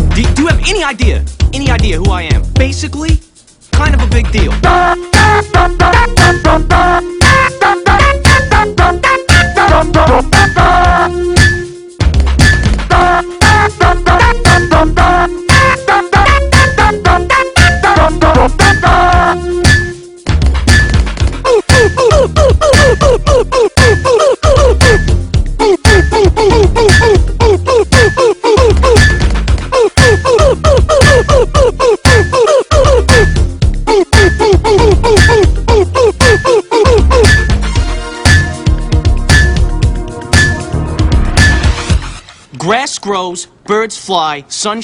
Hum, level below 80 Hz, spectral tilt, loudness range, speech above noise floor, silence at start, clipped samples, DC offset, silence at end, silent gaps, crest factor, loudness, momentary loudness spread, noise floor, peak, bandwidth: none; -14 dBFS; -5 dB/octave; 4 LU; 20 dB; 0 s; 0.2%; under 0.1%; 0 s; none; 8 dB; -9 LUFS; 7 LU; -29 dBFS; 0 dBFS; 15 kHz